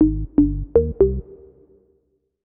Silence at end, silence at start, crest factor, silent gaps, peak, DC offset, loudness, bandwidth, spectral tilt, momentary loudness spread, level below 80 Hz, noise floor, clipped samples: 1.15 s; 0 s; 18 dB; none; -4 dBFS; under 0.1%; -20 LUFS; 2.1 kHz; -14 dB/octave; 2 LU; -30 dBFS; -67 dBFS; under 0.1%